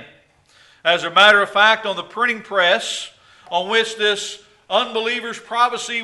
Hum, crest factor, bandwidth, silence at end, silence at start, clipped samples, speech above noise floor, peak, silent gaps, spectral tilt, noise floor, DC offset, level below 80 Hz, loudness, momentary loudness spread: none; 20 dB; 11.5 kHz; 0 s; 0 s; under 0.1%; 35 dB; 0 dBFS; none; -1.5 dB/octave; -53 dBFS; under 0.1%; -66 dBFS; -17 LUFS; 13 LU